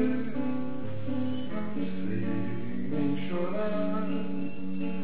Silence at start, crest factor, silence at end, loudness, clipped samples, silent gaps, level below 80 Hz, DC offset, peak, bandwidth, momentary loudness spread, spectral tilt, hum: 0 s; 14 dB; 0 s; -33 LUFS; under 0.1%; none; -58 dBFS; 4%; -14 dBFS; 4 kHz; 5 LU; -11 dB/octave; none